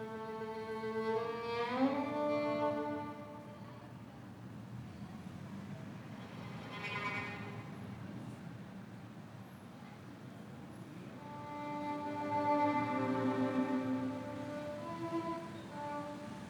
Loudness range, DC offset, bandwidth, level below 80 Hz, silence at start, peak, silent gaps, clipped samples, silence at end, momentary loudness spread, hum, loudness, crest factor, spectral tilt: 13 LU; under 0.1%; 19.5 kHz; -72 dBFS; 0 s; -22 dBFS; none; under 0.1%; 0 s; 17 LU; none; -40 LUFS; 18 dB; -7 dB/octave